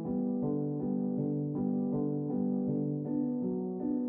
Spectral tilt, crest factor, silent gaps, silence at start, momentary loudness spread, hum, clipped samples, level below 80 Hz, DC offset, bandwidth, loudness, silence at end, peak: -12.5 dB/octave; 12 dB; none; 0 s; 2 LU; none; under 0.1%; -64 dBFS; under 0.1%; 1.9 kHz; -33 LUFS; 0 s; -20 dBFS